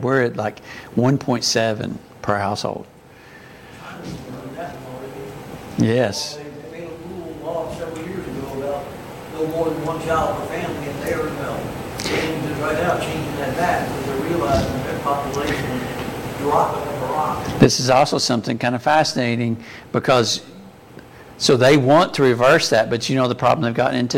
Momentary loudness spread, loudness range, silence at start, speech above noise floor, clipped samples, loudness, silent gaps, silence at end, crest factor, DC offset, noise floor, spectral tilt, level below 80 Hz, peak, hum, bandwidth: 18 LU; 10 LU; 0 s; 24 dB; under 0.1%; -20 LUFS; none; 0 s; 20 dB; under 0.1%; -43 dBFS; -5 dB/octave; -44 dBFS; 0 dBFS; none; 17 kHz